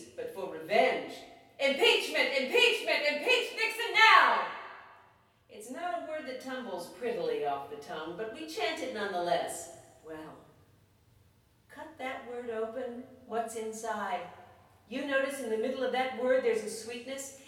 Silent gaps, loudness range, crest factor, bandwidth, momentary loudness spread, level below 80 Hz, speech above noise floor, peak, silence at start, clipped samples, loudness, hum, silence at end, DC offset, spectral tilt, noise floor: none; 15 LU; 24 dB; 17.5 kHz; 19 LU; -76 dBFS; 34 dB; -8 dBFS; 0 s; under 0.1%; -30 LUFS; none; 0 s; under 0.1%; -2 dB/octave; -65 dBFS